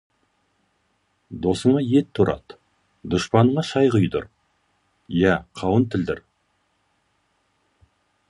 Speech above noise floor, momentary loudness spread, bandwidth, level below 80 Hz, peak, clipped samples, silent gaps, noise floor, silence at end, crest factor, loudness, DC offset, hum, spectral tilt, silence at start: 49 dB; 14 LU; 11.5 kHz; -48 dBFS; -2 dBFS; under 0.1%; none; -69 dBFS; 2.1 s; 20 dB; -21 LUFS; under 0.1%; none; -7 dB/octave; 1.3 s